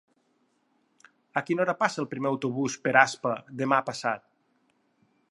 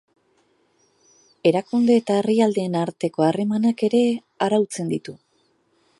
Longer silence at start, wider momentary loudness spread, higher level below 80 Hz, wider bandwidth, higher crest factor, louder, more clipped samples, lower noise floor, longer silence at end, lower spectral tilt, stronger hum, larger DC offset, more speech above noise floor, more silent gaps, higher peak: about the same, 1.35 s vs 1.45 s; first, 10 LU vs 7 LU; second, -78 dBFS vs -70 dBFS; about the same, 11.5 kHz vs 11.5 kHz; first, 26 dB vs 18 dB; second, -27 LUFS vs -21 LUFS; neither; first, -71 dBFS vs -65 dBFS; first, 1.15 s vs 0.85 s; second, -4.5 dB/octave vs -6.5 dB/octave; neither; neither; about the same, 44 dB vs 45 dB; neither; about the same, -4 dBFS vs -4 dBFS